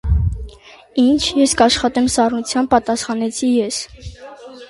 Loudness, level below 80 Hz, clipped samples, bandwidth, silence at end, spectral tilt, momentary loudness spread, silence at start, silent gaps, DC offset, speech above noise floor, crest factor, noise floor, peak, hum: -16 LUFS; -28 dBFS; under 0.1%; 11.5 kHz; 0.05 s; -4.5 dB/octave; 21 LU; 0.05 s; none; under 0.1%; 25 dB; 16 dB; -41 dBFS; 0 dBFS; none